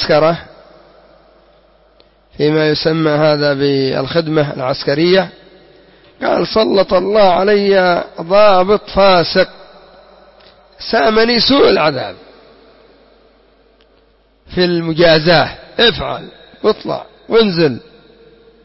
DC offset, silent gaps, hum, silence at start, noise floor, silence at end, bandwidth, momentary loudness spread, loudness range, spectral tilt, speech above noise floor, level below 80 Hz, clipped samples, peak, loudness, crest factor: under 0.1%; none; none; 0 s; -52 dBFS; 0.85 s; 6 kHz; 12 LU; 5 LU; -8.5 dB/octave; 40 dB; -42 dBFS; under 0.1%; 0 dBFS; -13 LUFS; 14 dB